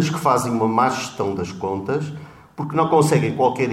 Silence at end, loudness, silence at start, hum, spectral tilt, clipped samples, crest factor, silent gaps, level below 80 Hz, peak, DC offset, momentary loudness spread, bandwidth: 0 s; -20 LUFS; 0 s; none; -6 dB/octave; under 0.1%; 16 dB; none; -56 dBFS; -4 dBFS; under 0.1%; 13 LU; 16 kHz